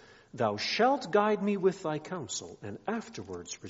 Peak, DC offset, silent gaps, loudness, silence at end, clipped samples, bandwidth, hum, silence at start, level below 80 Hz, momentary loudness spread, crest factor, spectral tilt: -12 dBFS; under 0.1%; none; -31 LUFS; 0 s; under 0.1%; 8 kHz; none; 0.1 s; -70 dBFS; 15 LU; 20 dB; -3.5 dB/octave